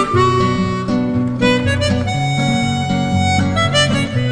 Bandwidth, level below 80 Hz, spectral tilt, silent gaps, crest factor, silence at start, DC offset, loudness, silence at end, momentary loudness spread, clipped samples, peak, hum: 10 kHz; -36 dBFS; -5.5 dB/octave; none; 16 dB; 0 s; under 0.1%; -16 LUFS; 0 s; 4 LU; under 0.1%; 0 dBFS; none